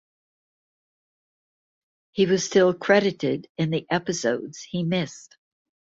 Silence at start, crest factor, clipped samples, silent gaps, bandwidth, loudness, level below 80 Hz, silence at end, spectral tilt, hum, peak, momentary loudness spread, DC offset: 2.15 s; 22 dB; under 0.1%; 3.49-3.55 s; 7.8 kHz; -23 LUFS; -66 dBFS; 0.7 s; -5 dB/octave; none; -4 dBFS; 11 LU; under 0.1%